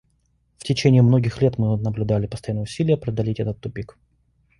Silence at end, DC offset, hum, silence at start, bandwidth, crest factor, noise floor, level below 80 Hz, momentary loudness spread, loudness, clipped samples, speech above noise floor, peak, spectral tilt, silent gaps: 0.75 s; under 0.1%; none; 0.6 s; 11 kHz; 18 dB; -65 dBFS; -46 dBFS; 16 LU; -21 LUFS; under 0.1%; 45 dB; -4 dBFS; -7.5 dB/octave; none